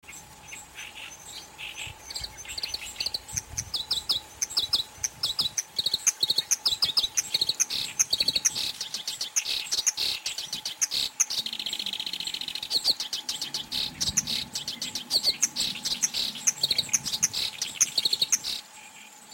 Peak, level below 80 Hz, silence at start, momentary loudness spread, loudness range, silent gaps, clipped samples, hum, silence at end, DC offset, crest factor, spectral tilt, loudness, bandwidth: -8 dBFS; -58 dBFS; 0.05 s; 15 LU; 6 LU; none; under 0.1%; none; 0 s; under 0.1%; 22 dB; 1 dB/octave; -26 LUFS; 17 kHz